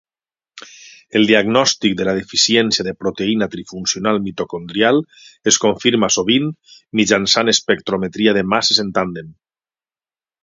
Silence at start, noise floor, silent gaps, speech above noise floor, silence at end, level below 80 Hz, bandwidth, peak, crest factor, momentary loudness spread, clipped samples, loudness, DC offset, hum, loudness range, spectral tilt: 0.55 s; under -90 dBFS; none; over 73 dB; 1.1 s; -54 dBFS; 7.8 kHz; 0 dBFS; 18 dB; 10 LU; under 0.1%; -16 LUFS; under 0.1%; none; 2 LU; -3 dB/octave